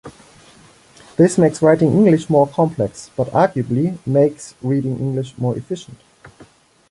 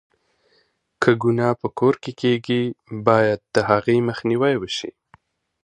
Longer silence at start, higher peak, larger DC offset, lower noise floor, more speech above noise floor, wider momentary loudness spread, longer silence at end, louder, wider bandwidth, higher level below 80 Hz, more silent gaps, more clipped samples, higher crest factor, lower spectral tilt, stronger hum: second, 0.05 s vs 1 s; about the same, 0 dBFS vs 0 dBFS; neither; second, -48 dBFS vs -64 dBFS; second, 32 dB vs 44 dB; first, 11 LU vs 6 LU; second, 0.5 s vs 0.75 s; first, -17 LUFS vs -20 LUFS; about the same, 11.5 kHz vs 10.5 kHz; about the same, -54 dBFS vs -58 dBFS; neither; neither; about the same, 18 dB vs 20 dB; about the same, -7.5 dB/octave vs -6.5 dB/octave; neither